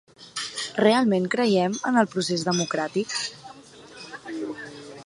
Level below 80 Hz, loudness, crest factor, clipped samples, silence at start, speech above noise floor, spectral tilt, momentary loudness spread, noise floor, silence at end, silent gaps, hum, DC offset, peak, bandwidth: -70 dBFS; -24 LUFS; 20 dB; under 0.1%; 0.2 s; 23 dB; -4.5 dB/octave; 19 LU; -46 dBFS; 0 s; none; none; under 0.1%; -6 dBFS; 11.5 kHz